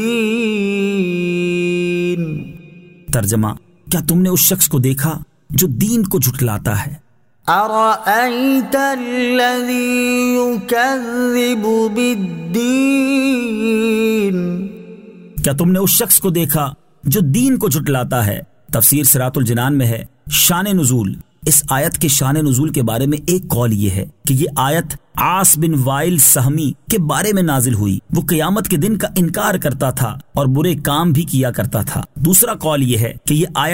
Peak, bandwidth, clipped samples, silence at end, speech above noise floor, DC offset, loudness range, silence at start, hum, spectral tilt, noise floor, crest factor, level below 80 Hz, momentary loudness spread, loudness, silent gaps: 0 dBFS; 16.5 kHz; under 0.1%; 0 s; 25 dB; under 0.1%; 3 LU; 0 s; none; -4.5 dB/octave; -40 dBFS; 16 dB; -42 dBFS; 9 LU; -15 LUFS; none